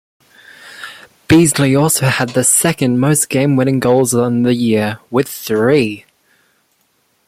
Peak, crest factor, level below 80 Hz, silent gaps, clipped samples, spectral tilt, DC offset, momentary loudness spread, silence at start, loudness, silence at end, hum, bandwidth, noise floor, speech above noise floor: 0 dBFS; 14 dB; -48 dBFS; none; under 0.1%; -4.5 dB/octave; under 0.1%; 9 LU; 0.65 s; -13 LUFS; 1.3 s; none; 16 kHz; -60 dBFS; 47 dB